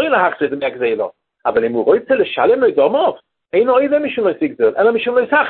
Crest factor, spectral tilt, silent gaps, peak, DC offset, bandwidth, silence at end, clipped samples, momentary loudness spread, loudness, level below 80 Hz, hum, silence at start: 14 dB; -9.5 dB/octave; none; 0 dBFS; under 0.1%; 4.3 kHz; 0 s; under 0.1%; 6 LU; -16 LUFS; -58 dBFS; none; 0 s